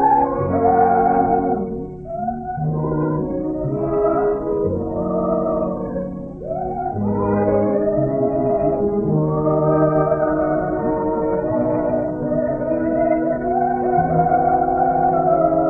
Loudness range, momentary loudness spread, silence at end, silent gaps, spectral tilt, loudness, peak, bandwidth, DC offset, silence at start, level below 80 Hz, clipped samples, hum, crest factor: 3 LU; 8 LU; 0 s; none; -13 dB/octave; -19 LUFS; -4 dBFS; 2.8 kHz; under 0.1%; 0 s; -40 dBFS; under 0.1%; none; 14 dB